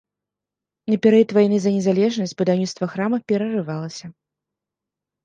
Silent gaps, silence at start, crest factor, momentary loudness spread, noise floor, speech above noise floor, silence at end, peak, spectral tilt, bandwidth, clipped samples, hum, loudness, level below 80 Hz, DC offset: none; 0.85 s; 18 dB; 14 LU; -87 dBFS; 68 dB; 1.15 s; -4 dBFS; -6.5 dB/octave; 9 kHz; under 0.1%; 50 Hz at -40 dBFS; -20 LUFS; -68 dBFS; under 0.1%